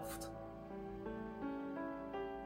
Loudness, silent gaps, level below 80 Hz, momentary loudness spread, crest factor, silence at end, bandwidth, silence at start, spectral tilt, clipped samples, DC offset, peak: -46 LUFS; none; -62 dBFS; 5 LU; 12 dB; 0 s; 16 kHz; 0 s; -5.5 dB/octave; under 0.1%; under 0.1%; -32 dBFS